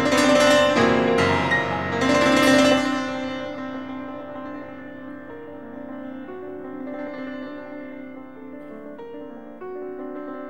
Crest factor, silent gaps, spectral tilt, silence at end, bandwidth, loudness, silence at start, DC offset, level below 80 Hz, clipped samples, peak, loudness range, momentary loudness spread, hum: 18 dB; none; -4 dB/octave; 0 s; 14.5 kHz; -20 LUFS; 0 s; 0.4%; -56 dBFS; under 0.1%; -6 dBFS; 17 LU; 22 LU; none